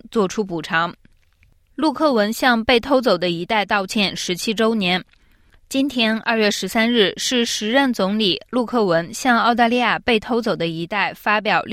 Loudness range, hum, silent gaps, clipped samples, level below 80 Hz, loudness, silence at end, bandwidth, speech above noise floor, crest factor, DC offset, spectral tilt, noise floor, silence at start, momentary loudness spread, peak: 2 LU; none; none; under 0.1%; -52 dBFS; -19 LUFS; 0 s; 16 kHz; 37 dB; 16 dB; under 0.1%; -4 dB/octave; -56 dBFS; 0.05 s; 6 LU; -4 dBFS